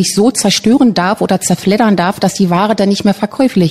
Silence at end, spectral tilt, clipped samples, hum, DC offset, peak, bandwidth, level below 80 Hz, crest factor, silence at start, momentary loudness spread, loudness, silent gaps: 0 s; -5 dB/octave; under 0.1%; none; 0.2%; -2 dBFS; 15 kHz; -48 dBFS; 10 dB; 0 s; 4 LU; -11 LUFS; none